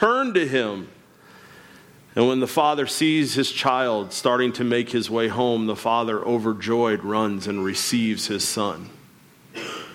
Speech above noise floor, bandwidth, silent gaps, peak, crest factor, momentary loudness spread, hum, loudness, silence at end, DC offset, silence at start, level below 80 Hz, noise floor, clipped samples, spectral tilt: 29 dB; 17 kHz; none; -6 dBFS; 18 dB; 10 LU; none; -22 LUFS; 0 s; under 0.1%; 0 s; -66 dBFS; -51 dBFS; under 0.1%; -4 dB/octave